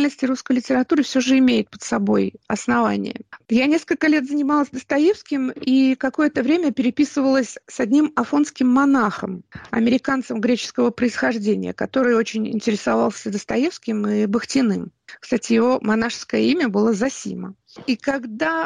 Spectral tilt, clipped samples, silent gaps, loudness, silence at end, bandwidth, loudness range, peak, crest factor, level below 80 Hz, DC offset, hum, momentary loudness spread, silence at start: -5 dB/octave; under 0.1%; none; -20 LUFS; 0 s; 10 kHz; 2 LU; -8 dBFS; 12 dB; -58 dBFS; under 0.1%; none; 8 LU; 0 s